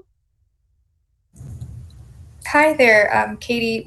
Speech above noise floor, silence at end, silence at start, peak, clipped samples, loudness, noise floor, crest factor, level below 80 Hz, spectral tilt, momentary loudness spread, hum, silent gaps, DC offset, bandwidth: 50 dB; 0 s; 1.4 s; -4 dBFS; under 0.1%; -15 LUFS; -66 dBFS; 18 dB; -48 dBFS; -4.5 dB/octave; 24 LU; none; none; under 0.1%; 12.5 kHz